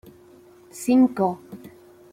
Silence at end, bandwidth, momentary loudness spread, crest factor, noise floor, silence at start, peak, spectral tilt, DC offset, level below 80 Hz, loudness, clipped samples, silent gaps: 0.45 s; 15 kHz; 24 LU; 16 dB; -50 dBFS; 0.75 s; -8 dBFS; -6.5 dB/octave; under 0.1%; -66 dBFS; -21 LUFS; under 0.1%; none